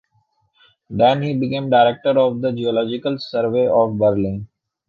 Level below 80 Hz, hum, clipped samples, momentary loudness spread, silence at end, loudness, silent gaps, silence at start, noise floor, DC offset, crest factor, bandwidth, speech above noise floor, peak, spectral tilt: -52 dBFS; none; under 0.1%; 8 LU; 0.45 s; -18 LUFS; none; 0.9 s; -64 dBFS; under 0.1%; 16 dB; 6.8 kHz; 47 dB; -2 dBFS; -8.5 dB/octave